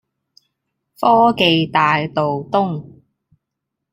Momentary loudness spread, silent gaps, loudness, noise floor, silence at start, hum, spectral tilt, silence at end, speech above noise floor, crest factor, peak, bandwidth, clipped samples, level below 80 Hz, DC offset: 8 LU; none; -16 LUFS; -79 dBFS; 1 s; none; -6.5 dB/octave; 1.05 s; 64 dB; 18 dB; -2 dBFS; 16 kHz; under 0.1%; -58 dBFS; under 0.1%